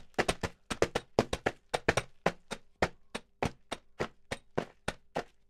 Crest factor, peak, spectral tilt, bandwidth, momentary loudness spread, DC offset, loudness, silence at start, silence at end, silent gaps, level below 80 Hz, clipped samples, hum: 28 dB; -8 dBFS; -4.5 dB/octave; 16 kHz; 13 LU; under 0.1%; -36 LUFS; 0 s; 0.25 s; none; -52 dBFS; under 0.1%; none